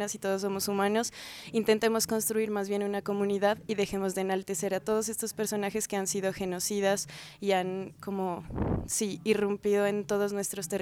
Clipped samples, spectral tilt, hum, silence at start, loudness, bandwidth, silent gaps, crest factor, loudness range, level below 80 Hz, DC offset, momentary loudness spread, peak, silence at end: under 0.1%; -4 dB/octave; none; 0 s; -30 LUFS; 18 kHz; none; 18 dB; 2 LU; -54 dBFS; under 0.1%; 6 LU; -12 dBFS; 0 s